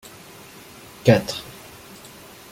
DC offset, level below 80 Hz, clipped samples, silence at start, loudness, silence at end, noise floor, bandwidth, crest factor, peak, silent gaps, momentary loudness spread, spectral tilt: under 0.1%; -54 dBFS; under 0.1%; 1.05 s; -21 LUFS; 1 s; -44 dBFS; 17 kHz; 24 dB; -2 dBFS; none; 24 LU; -6 dB/octave